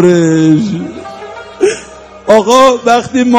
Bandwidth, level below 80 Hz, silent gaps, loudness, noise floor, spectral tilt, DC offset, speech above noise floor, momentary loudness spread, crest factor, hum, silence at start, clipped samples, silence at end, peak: 14 kHz; -46 dBFS; none; -9 LUFS; -31 dBFS; -5.5 dB/octave; under 0.1%; 24 dB; 19 LU; 10 dB; none; 0 s; 3%; 0 s; 0 dBFS